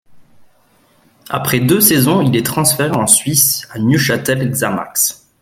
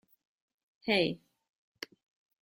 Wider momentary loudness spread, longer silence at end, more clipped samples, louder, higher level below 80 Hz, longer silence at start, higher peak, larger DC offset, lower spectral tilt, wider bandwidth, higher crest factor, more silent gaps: second, 7 LU vs 18 LU; second, 0.25 s vs 1.25 s; neither; first, -13 LUFS vs -31 LUFS; first, -48 dBFS vs -72 dBFS; second, 0.1 s vs 0.85 s; first, 0 dBFS vs -14 dBFS; neither; second, -3.5 dB/octave vs -5 dB/octave; about the same, 17 kHz vs 16.5 kHz; second, 16 dB vs 22 dB; neither